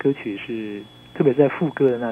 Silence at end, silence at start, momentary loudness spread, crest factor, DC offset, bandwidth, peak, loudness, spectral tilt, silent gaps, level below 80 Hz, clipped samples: 0 s; 0 s; 16 LU; 18 dB; under 0.1%; 4.4 kHz; -2 dBFS; -21 LUFS; -9 dB/octave; none; -62 dBFS; under 0.1%